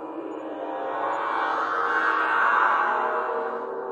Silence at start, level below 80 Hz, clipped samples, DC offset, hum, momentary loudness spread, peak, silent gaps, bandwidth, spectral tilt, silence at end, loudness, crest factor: 0 s; -82 dBFS; under 0.1%; under 0.1%; none; 13 LU; -10 dBFS; none; 10 kHz; -3.5 dB/octave; 0 s; -24 LUFS; 16 dB